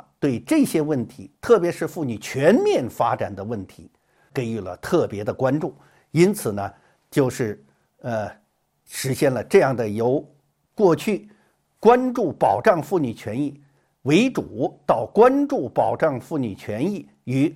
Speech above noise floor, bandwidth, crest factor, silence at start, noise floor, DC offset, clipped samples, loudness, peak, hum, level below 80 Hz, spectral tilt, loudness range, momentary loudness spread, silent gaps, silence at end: 34 dB; 16.5 kHz; 20 dB; 0.2 s; -55 dBFS; under 0.1%; under 0.1%; -22 LUFS; -2 dBFS; none; -58 dBFS; -6.5 dB/octave; 4 LU; 13 LU; none; 0 s